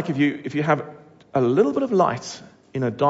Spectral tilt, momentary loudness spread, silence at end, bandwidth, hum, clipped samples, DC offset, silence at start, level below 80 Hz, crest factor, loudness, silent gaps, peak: -6.5 dB/octave; 15 LU; 0 s; 8 kHz; none; under 0.1%; under 0.1%; 0 s; -64 dBFS; 16 dB; -22 LUFS; none; -6 dBFS